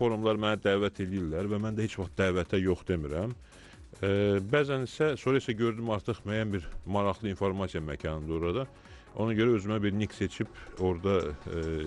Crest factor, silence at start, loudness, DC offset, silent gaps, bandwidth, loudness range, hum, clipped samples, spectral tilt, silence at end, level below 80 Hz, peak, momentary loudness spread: 16 dB; 0 s; -31 LUFS; under 0.1%; none; 11.5 kHz; 2 LU; none; under 0.1%; -7 dB/octave; 0 s; -50 dBFS; -14 dBFS; 8 LU